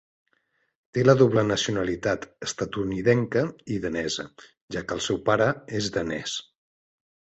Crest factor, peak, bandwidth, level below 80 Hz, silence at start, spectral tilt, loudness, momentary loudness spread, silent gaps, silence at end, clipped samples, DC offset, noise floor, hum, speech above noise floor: 22 dB; -4 dBFS; 8.2 kHz; -54 dBFS; 0.95 s; -5 dB/octave; -25 LUFS; 12 LU; 4.61-4.68 s; 1 s; under 0.1%; under 0.1%; -71 dBFS; none; 47 dB